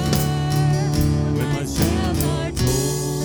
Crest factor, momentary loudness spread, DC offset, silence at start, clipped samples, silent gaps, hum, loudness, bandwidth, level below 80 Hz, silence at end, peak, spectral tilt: 18 dB; 3 LU; under 0.1%; 0 s; under 0.1%; none; none; -21 LUFS; over 20 kHz; -32 dBFS; 0 s; -2 dBFS; -5.5 dB/octave